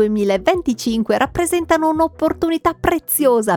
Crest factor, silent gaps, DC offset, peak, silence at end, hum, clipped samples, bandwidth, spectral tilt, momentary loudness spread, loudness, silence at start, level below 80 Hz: 16 dB; none; under 0.1%; 0 dBFS; 0 s; none; under 0.1%; over 20 kHz; -4.5 dB/octave; 4 LU; -17 LUFS; 0 s; -40 dBFS